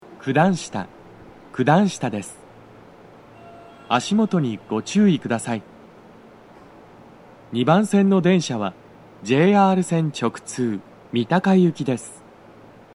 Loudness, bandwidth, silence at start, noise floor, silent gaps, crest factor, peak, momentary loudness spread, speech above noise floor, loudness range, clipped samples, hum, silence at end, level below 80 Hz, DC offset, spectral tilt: -20 LUFS; 11.5 kHz; 0.1 s; -46 dBFS; none; 18 dB; -4 dBFS; 14 LU; 27 dB; 6 LU; under 0.1%; none; 0.8 s; -62 dBFS; under 0.1%; -6 dB/octave